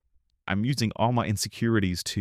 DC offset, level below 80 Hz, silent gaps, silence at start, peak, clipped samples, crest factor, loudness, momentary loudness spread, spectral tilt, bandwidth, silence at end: under 0.1%; -54 dBFS; none; 0.45 s; -10 dBFS; under 0.1%; 16 dB; -26 LUFS; 5 LU; -5 dB/octave; 15.5 kHz; 0 s